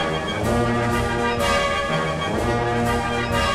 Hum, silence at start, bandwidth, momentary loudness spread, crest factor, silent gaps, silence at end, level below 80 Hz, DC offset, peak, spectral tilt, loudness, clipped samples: none; 0 s; 16 kHz; 3 LU; 14 dB; none; 0 s; -34 dBFS; 0.2%; -8 dBFS; -5 dB/octave; -21 LUFS; under 0.1%